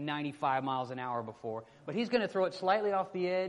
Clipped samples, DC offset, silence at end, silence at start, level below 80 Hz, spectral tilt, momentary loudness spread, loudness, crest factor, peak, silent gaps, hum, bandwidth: under 0.1%; under 0.1%; 0 s; 0 s; -76 dBFS; -6.5 dB/octave; 10 LU; -34 LUFS; 18 dB; -16 dBFS; none; none; 11 kHz